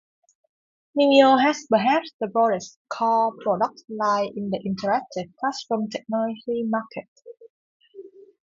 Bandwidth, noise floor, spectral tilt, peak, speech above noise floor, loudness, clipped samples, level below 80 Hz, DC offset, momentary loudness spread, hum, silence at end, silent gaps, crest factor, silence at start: 7.6 kHz; -45 dBFS; -5 dB/octave; -4 dBFS; 23 dB; -23 LUFS; under 0.1%; -70 dBFS; under 0.1%; 12 LU; none; 0.35 s; 2.13-2.19 s, 2.76-2.85 s, 7.08-7.16 s, 7.50-7.80 s; 20 dB; 0.95 s